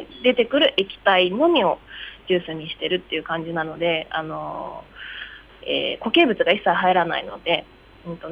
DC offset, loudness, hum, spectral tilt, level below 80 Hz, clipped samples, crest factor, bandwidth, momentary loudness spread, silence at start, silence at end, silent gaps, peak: under 0.1%; -21 LUFS; none; -6.5 dB/octave; -54 dBFS; under 0.1%; 18 dB; 5.8 kHz; 18 LU; 0 s; 0 s; none; -4 dBFS